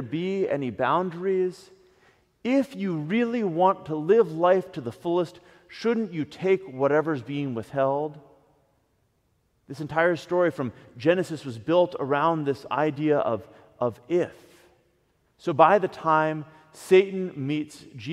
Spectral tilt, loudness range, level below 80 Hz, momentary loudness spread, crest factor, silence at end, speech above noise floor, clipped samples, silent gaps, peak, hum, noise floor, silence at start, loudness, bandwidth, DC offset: -7 dB/octave; 4 LU; -68 dBFS; 13 LU; 22 dB; 0 s; 45 dB; under 0.1%; none; -2 dBFS; none; -69 dBFS; 0 s; -25 LUFS; 13 kHz; under 0.1%